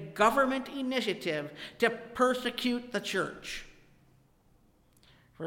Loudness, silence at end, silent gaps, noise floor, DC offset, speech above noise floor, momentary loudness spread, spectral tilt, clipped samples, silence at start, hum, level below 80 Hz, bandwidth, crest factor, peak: -31 LUFS; 0 s; none; -65 dBFS; under 0.1%; 34 dB; 12 LU; -4 dB/octave; under 0.1%; 0 s; none; -60 dBFS; 17 kHz; 20 dB; -12 dBFS